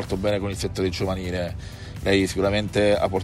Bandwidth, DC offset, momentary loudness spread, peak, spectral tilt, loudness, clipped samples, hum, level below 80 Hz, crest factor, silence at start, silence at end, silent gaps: 15.5 kHz; under 0.1%; 9 LU; -8 dBFS; -5.5 dB/octave; -24 LUFS; under 0.1%; none; -40 dBFS; 16 dB; 0 s; 0 s; none